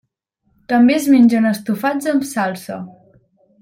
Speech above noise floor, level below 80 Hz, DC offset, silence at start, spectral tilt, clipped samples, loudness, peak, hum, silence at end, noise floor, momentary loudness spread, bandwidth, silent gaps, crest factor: 51 dB; -60 dBFS; under 0.1%; 0.7 s; -5.5 dB/octave; under 0.1%; -15 LUFS; -2 dBFS; none; 0.7 s; -66 dBFS; 18 LU; 16.5 kHz; none; 14 dB